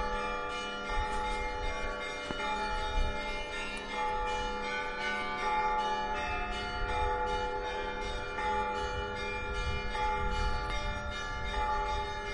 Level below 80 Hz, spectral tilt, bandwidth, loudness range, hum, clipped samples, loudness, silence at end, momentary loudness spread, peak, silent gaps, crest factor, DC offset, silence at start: -40 dBFS; -4 dB/octave; 11 kHz; 2 LU; none; under 0.1%; -34 LUFS; 0 s; 4 LU; -18 dBFS; none; 16 dB; under 0.1%; 0 s